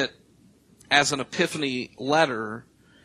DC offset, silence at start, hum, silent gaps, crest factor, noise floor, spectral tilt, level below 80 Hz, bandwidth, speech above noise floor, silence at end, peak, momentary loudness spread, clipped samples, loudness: under 0.1%; 0 s; none; none; 24 dB; -58 dBFS; -3 dB/octave; -64 dBFS; 13 kHz; 33 dB; 0.45 s; -2 dBFS; 12 LU; under 0.1%; -24 LUFS